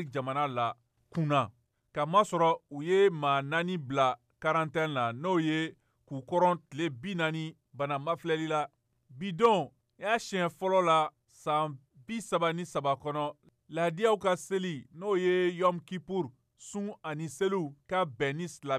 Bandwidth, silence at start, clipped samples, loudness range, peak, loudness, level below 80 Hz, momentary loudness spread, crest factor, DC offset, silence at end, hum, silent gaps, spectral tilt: 14 kHz; 0 s; under 0.1%; 4 LU; -12 dBFS; -31 LUFS; -72 dBFS; 13 LU; 18 dB; under 0.1%; 0 s; none; none; -5.5 dB/octave